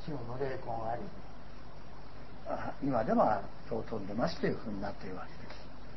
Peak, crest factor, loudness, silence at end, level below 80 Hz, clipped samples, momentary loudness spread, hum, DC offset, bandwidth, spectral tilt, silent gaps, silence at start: -16 dBFS; 22 dB; -36 LUFS; 0 s; -54 dBFS; under 0.1%; 21 LU; 50 Hz at -55 dBFS; 1%; 6 kHz; -6 dB/octave; none; 0 s